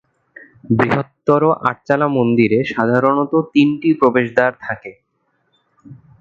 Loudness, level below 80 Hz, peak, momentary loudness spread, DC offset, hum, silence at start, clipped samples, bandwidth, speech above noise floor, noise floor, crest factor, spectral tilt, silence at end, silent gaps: -16 LUFS; -56 dBFS; 0 dBFS; 6 LU; under 0.1%; none; 0.7 s; under 0.1%; 7.4 kHz; 51 dB; -66 dBFS; 16 dB; -8.5 dB/octave; 0.25 s; none